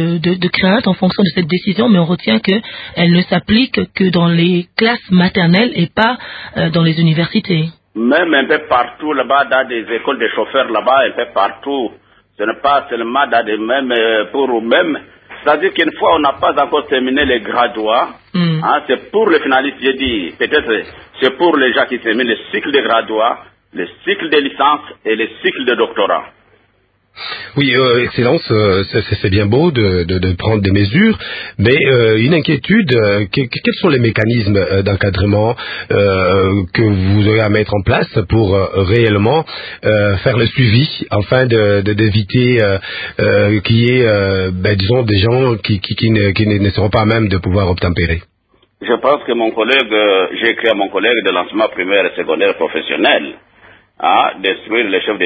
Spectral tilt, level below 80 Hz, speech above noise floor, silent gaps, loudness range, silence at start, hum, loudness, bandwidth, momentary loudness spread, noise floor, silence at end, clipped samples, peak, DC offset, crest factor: -9 dB/octave; -34 dBFS; 44 dB; none; 3 LU; 0 s; none; -13 LUFS; 5 kHz; 6 LU; -57 dBFS; 0 s; under 0.1%; 0 dBFS; under 0.1%; 14 dB